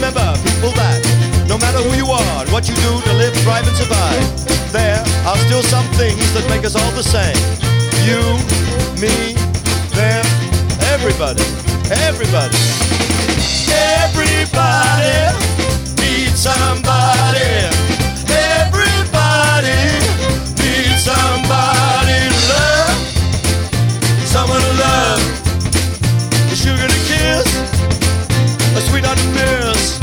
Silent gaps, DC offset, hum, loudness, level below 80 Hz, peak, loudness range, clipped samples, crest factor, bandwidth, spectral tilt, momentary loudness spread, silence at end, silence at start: none; under 0.1%; none; -13 LUFS; -24 dBFS; 0 dBFS; 2 LU; under 0.1%; 12 dB; 19.5 kHz; -4 dB/octave; 4 LU; 0 s; 0 s